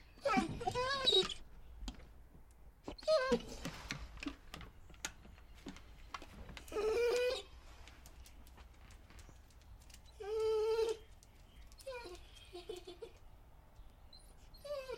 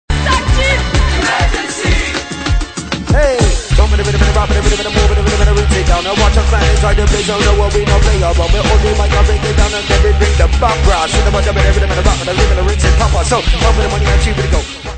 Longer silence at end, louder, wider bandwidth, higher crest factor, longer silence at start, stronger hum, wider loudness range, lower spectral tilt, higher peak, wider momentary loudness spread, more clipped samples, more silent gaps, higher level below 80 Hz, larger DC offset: about the same, 0 s vs 0 s; second, -38 LUFS vs -12 LUFS; first, 16.5 kHz vs 9.2 kHz; first, 22 dB vs 10 dB; about the same, 0 s vs 0.1 s; neither; first, 14 LU vs 2 LU; about the same, -3.5 dB/octave vs -4.5 dB/octave; second, -20 dBFS vs 0 dBFS; first, 26 LU vs 3 LU; neither; neither; second, -58 dBFS vs -12 dBFS; neither